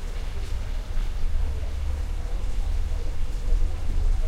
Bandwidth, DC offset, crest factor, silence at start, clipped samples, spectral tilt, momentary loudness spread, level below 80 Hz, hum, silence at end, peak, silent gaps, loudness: 9.4 kHz; 0.5%; 12 dB; 0 s; under 0.1%; -6 dB/octave; 4 LU; -24 dBFS; none; 0 s; -10 dBFS; none; -32 LUFS